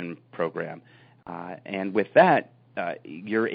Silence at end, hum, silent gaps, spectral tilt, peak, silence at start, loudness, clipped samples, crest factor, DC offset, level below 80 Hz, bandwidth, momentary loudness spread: 0 s; none; none; -4.5 dB/octave; -6 dBFS; 0 s; -25 LUFS; under 0.1%; 20 dB; under 0.1%; -70 dBFS; 5 kHz; 19 LU